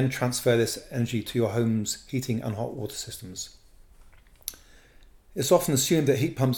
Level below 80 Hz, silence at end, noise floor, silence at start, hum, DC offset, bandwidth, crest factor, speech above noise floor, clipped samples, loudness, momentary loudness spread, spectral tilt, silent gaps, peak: -54 dBFS; 0 s; -54 dBFS; 0 s; none; under 0.1%; 19 kHz; 20 dB; 28 dB; under 0.1%; -26 LUFS; 16 LU; -5 dB/octave; none; -6 dBFS